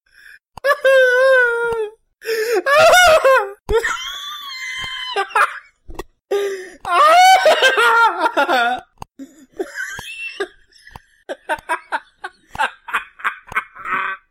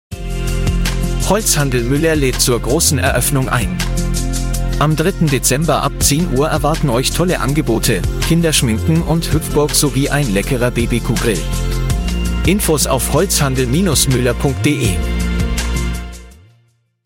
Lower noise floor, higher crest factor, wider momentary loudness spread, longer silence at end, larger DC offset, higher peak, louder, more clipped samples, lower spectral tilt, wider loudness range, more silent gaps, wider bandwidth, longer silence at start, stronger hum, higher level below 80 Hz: second, -46 dBFS vs -56 dBFS; about the same, 14 dB vs 14 dB; first, 19 LU vs 6 LU; second, 0.15 s vs 0.7 s; neither; second, -4 dBFS vs 0 dBFS; about the same, -15 LUFS vs -15 LUFS; neither; second, -1.5 dB/octave vs -4.5 dB/octave; first, 13 LU vs 2 LU; neither; about the same, 16.5 kHz vs 17 kHz; first, 0.65 s vs 0.1 s; neither; second, -42 dBFS vs -22 dBFS